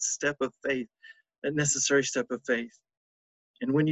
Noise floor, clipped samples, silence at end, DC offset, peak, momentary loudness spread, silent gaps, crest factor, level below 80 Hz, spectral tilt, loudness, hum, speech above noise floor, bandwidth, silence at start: under -90 dBFS; under 0.1%; 0 s; under 0.1%; -12 dBFS; 12 LU; 1.38-1.42 s, 2.97-3.54 s; 18 dB; -68 dBFS; -3.5 dB/octave; -29 LUFS; none; over 61 dB; 9.2 kHz; 0 s